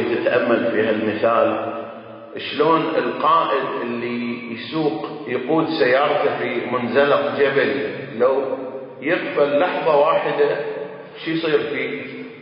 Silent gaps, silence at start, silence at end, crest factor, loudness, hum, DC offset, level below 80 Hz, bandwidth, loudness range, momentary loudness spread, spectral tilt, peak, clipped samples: none; 0 s; 0 s; 16 dB; -20 LUFS; none; under 0.1%; -66 dBFS; 5.4 kHz; 2 LU; 12 LU; -10 dB/octave; -4 dBFS; under 0.1%